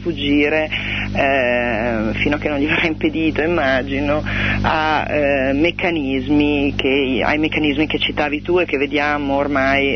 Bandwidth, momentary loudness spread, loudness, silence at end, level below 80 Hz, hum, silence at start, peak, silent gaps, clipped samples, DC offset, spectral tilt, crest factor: 6.4 kHz; 3 LU; -17 LUFS; 0 s; -34 dBFS; 50 Hz at -30 dBFS; 0 s; -2 dBFS; none; under 0.1%; under 0.1%; -6.5 dB/octave; 14 dB